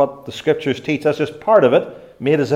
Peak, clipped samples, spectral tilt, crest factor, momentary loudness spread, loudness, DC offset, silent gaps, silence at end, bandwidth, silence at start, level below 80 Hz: 0 dBFS; under 0.1%; -6.5 dB/octave; 16 dB; 11 LU; -17 LUFS; under 0.1%; none; 0 s; 13.5 kHz; 0 s; -58 dBFS